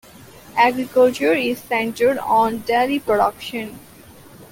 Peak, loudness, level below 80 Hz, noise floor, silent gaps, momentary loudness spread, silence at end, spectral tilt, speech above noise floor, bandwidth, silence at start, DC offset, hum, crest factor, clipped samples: -2 dBFS; -19 LUFS; -56 dBFS; -44 dBFS; none; 11 LU; 0.05 s; -4.5 dB/octave; 25 dB; 17 kHz; 0.35 s; under 0.1%; none; 16 dB; under 0.1%